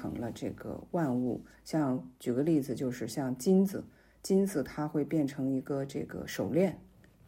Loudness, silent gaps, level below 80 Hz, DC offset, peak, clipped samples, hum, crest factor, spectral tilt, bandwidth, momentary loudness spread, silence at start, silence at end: -32 LUFS; none; -64 dBFS; under 0.1%; -16 dBFS; under 0.1%; none; 16 dB; -7 dB/octave; 16 kHz; 11 LU; 0 s; 0.45 s